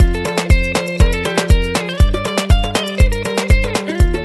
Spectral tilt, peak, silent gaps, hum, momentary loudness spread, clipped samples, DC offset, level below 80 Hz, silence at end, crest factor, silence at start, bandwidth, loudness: -5 dB/octave; -2 dBFS; none; none; 4 LU; under 0.1%; 0.3%; -16 dBFS; 0 s; 12 dB; 0 s; 12.5 kHz; -16 LUFS